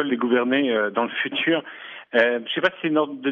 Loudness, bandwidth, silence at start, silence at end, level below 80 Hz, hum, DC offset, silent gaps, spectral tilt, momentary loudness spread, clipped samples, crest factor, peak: -22 LUFS; 6.6 kHz; 0 s; 0 s; -76 dBFS; none; under 0.1%; none; -6.5 dB/octave; 4 LU; under 0.1%; 16 dB; -6 dBFS